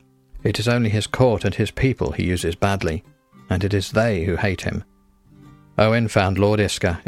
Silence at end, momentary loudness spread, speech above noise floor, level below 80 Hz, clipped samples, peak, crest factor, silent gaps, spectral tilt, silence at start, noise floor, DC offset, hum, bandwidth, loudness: 0.05 s; 8 LU; 33 dB; -40 dBFS; under 0.1%; -4 dBFS; 18 dB; none; -6 dB/octave; 0.35 s; -52 dBFS; under 0.1%; none; 14.5 kHz; -21 LUFS